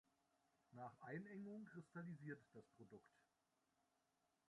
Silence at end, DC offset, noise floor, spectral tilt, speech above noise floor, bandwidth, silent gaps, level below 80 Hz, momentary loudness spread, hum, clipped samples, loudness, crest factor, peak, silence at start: 1.3 s; under 0.1%; -88 dBFS; -8.5 dB/octave; 30 dB; 10.5 kHz; none; under -90 dBFS; 13 LU; none; under 0.1%; -58 LUFS; 20 dB; -40 dBFS; 0.7 s